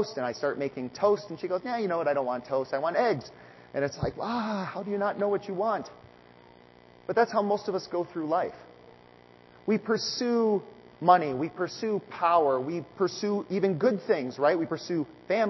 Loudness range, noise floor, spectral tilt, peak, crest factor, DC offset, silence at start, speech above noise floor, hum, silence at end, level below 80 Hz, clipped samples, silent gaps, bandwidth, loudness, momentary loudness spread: 4 LU; -55 dBFS; -5.5 dB/octave; -6 dBFS; 22 dB; under 0.1%; 0 s; 27 dB; 60 Hz at -60 dBFS; 0 s; -62 dBFS; under 0.1%; none; 6.2 kHz; -28 LUFS; 8 LU